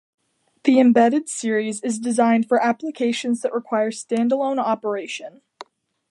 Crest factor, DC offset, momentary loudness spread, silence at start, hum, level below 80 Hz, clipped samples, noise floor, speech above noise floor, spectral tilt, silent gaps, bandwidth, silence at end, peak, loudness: 18 dB; under 0.1%; 10 LU; 0.65 s; none; -74 dBFS; under 0.1%; -45 dBFS; 25 dB; -4.5 dB/octave; none; 11.5 kHz; 0.5 s; -4 dBFS; -20 LUFS